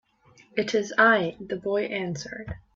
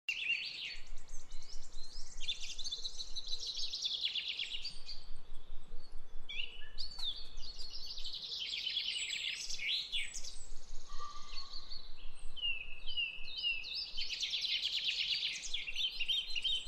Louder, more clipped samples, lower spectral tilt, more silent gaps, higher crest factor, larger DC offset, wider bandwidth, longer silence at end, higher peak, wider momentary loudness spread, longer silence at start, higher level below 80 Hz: first, -25 LUFS vs -38 LUFS; neither; first, -4.5 dB/octave vs 0.5 dB/octave; neither; first, 20 dB vs 14 dB; neither; second, 7.8 kHz vs 9.2 kHz; first, 0.2 s vs 0 s; first, -6 dBFS vs -22 dBFS; second, 15 LU vs 19 LU; first, 0.55 s vs 0.1 s; second, -54 dBFS vs -46 dBFS